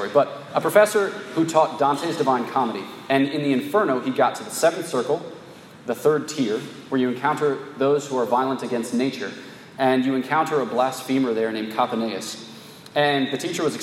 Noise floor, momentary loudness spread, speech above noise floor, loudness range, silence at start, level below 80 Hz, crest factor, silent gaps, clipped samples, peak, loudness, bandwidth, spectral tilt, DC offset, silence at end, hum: -43 dBFS; 10 LU; 21 dB; 3 LU; 0 s; -74 dBFS; 20 dB; none; under 0.1%; -2 dBFS; -22 LUFS; 16 kHz; -4.5 dB/octave; under 0.1%; 0 s; none